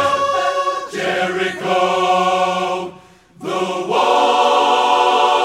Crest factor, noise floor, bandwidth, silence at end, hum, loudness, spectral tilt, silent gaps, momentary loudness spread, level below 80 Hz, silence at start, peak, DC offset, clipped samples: 14 dB; -44 dBFS; 15 kHz; 0 s; none; -16 LUFS; -3.5 dB/octave; none; 9 LU; -62 dBFS; 0 s; -2 dBFS; under 0.1%; under 0.1%